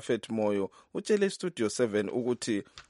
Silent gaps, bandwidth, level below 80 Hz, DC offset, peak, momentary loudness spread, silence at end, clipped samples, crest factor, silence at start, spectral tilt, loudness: none; 11.5 kHz; -72 dBFS; under 0.1%; -14 dBFS; 6 LU; 0.1 s; under 0.1%; 16 dB; 0 s; -5 dB/octave; -31 LUFS